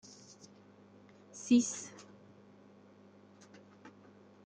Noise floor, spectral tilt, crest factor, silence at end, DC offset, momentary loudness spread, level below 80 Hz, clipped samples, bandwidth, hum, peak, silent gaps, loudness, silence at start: -60 dBFS; -3.5 dB/octave; 24 dB; 0.55 s; under 0.1%; 29 LU; -80 dBFS; under 0.1%; 9.4 kHz; 50 Hz at -60 dBFS; -16 dBFS; none; -32 LUFS; 1.35 s